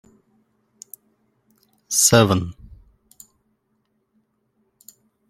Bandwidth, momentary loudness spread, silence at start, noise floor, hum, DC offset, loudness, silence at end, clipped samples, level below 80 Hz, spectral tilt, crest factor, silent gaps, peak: 16.5 kHz; 28 LU; 1.9 s; -70 dBFS; none; under 0.1%; -16 LUFS; 2.75 s; under 0.1%; -54 dBFS; -3.5 dB/octave; 24 dB; none; -2 dBFS